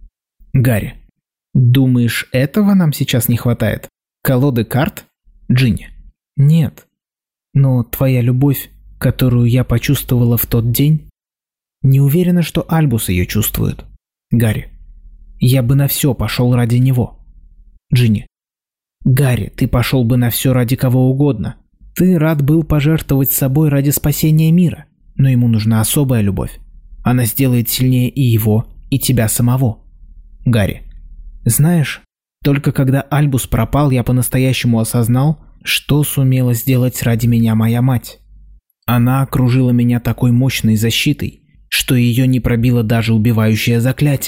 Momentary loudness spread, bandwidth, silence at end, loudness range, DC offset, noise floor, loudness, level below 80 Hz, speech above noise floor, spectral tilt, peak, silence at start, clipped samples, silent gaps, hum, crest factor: 7 LU; 16.5 kHz; 0 s; 3 LU; 0.2%; under -90 dBFS; -14 LUFS; -34 dBFS; over 77 dB; -6 dB/octave; -4 dBFS; 0.05 s; under 0.1%; none; none; 10 dB